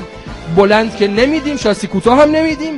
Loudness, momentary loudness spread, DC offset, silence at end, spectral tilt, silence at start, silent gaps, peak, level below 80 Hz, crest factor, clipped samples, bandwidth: -12 LUFS; 7 LU; under 0.1%; 0 s; -5.5 dB/octave; 0 s; none; 0 dBFS; -36 dBFS; 12 dB; under 0.1%; 11.5 kHz